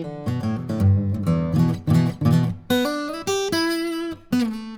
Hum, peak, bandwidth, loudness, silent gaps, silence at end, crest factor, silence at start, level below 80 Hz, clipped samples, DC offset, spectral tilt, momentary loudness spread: none; -6 dBFS; 19 kHz; -22 LUFS; none; 0 s; 14 dB; 0 s; -50 dBFS; under 0.1%; under 0.1%; -6.5 dB/octave; 7 LU